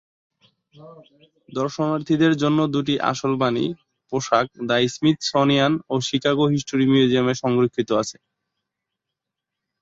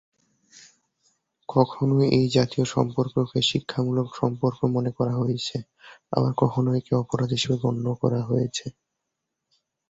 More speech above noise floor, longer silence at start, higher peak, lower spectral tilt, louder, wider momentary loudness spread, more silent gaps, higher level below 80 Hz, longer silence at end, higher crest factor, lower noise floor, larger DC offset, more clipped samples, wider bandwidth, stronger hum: first, 63 dB vs 58 dB; first, 0.8 s vs 0.55 s; about the same, -4 dBFS vs -4 dBFS; about the same, -5.5 dB/octave vs -6.5 dB/octave; first, -21 LUFS vs -24 LUFS; about the same, 9 LU vs 7 LU; neither; about the same, -60 dBFS vs -56 dBFS; first, 1.7 s vs 1.2 s; about the same, 18 dB vs 22 dB; about the same, -84 dBFS vs -82 dBFS; neither; neither; about the same, 8 kHz vs 8 kHz; neither